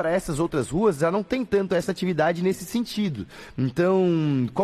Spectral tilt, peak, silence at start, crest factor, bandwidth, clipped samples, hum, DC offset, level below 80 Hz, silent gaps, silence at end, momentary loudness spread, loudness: -6.5 dB/octave; -10 dBFS; 0 s; 14 dB; 14 kHz; under 0.1%; none; under 0.1%; -50 dBFS; none; 0 s; 7 LU; -24 LUFS